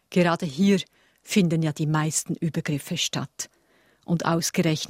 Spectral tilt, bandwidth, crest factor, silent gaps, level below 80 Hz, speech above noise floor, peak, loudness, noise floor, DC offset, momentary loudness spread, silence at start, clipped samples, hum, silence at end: -5 dB/octave; 16 kHz; 18 dB; none; -62 dBFS; 38 dB; -6 dBFS; -25 LUFS; -62 dBFS; under 0.1%; 9 LU; 0.1 s; under 0.1%; none; 0 s